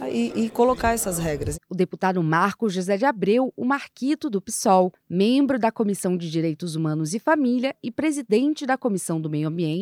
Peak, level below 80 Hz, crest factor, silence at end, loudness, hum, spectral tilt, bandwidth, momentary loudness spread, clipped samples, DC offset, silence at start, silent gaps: -6 dBFS; -48 dBFS; 18 dB; 0 s; -23 LUFS; none; -5.5 dB/octave; 17 kHz; 6 LU; under 0.1%; under 0.1%; 0 s; none